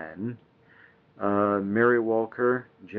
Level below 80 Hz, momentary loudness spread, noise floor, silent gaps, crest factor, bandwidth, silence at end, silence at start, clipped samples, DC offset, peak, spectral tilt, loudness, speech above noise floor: -74 dBFS; 14 LU; -57 dBFS; none; 18 dB; 4 kHz; 0 s; 0 s; under 0.1%; under 0.1%; -8 dBFS; -7 dB/octave; -26 LUFS; 31 dB